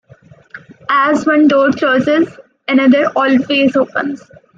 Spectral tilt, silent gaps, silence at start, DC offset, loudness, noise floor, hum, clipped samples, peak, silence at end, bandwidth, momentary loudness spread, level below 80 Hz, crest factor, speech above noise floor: -5.5 dB/octave; none; 0.55 s; under 0.1%; -13 LUFS; -44 dBFS; none; under 0.1%; 0 dBFS; 0.4 s; 7.6 kHz; 11 LU; -60 dBFS; 12 dB; 31 dB